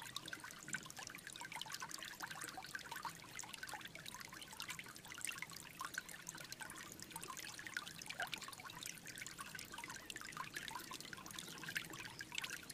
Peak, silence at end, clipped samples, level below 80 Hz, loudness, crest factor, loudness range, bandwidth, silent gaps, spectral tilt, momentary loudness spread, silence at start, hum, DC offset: -24 dBFS; 0 s; under 0.1%; -76 dBFS; -49 LUFS; 26 dB; 1 LU; 15.5 kHz; none; -1 dB/octave; 5 LU; 0 s; none; under 0.1%